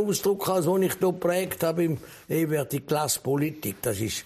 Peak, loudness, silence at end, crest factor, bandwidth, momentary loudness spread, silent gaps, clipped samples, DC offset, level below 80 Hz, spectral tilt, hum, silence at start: -12 dBFS; -26 LUFS; 0 s; 14 dB; 15.5 kHz; 5 LU; none; under 0.1%; under 0.1%; -60 dBFS; -5 dB/octave; none; 0 s